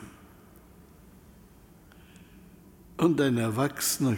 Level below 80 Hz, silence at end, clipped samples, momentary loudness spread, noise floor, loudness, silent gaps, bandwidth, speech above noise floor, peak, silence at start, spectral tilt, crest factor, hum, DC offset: -60 dBFS; 0 s; under 0.1%; 18 LU; -54 dBFS; -26 LUFS; none; 17 kHz; 29 dB; -12 dBFS; 0 s; -5 dB/octave; 20 dB; none; under 0.1%